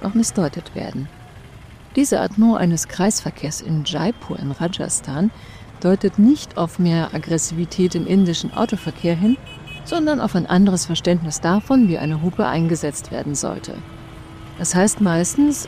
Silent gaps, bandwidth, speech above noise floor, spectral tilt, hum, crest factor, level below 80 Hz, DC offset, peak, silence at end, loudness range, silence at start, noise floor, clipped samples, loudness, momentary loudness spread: none; 15.5 kHz; 22 dB; -5 dB/octave; none; 14 dB; -44 dBFS; under 0.1%; -6 dBFS; 0 s; 3 LU; 0 s; -40 dBFS; under 0.1%; -19 LUFS; 14 LU